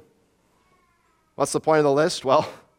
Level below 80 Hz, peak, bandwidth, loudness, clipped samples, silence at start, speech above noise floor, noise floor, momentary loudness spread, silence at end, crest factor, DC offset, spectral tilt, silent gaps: -66 dBFS; -4 dBFS; 16.5 kHz; -21 LUFS; under 0.1%; 1.4 s; 44 dB; -65 dBFS; 6 LU; 0.2 s; 20 dB; under 0.1%; -4.5 dB/octave; none